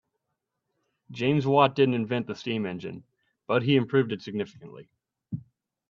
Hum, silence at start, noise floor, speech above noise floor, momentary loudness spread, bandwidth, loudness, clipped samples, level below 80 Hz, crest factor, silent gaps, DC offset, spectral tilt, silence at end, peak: none; 1.1 s; -82 dBFS; 57 dB; 18 LU; 7.2 kHz; -26 LUFS; under 0.1%; -70 dBFS; 22 dB; none; under 0.1%; -7.5 dB/octave; 0.5 s; -6 dBFS